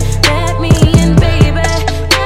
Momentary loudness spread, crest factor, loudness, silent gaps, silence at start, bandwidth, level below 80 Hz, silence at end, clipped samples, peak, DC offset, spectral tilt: 6 LU; 10 dB; -11 LUFS; none; 0 s; 16 kHz; -16 dBFS; 0 s; under 0.1%; 0 dBFS; under 0.1%; -5 dB/octave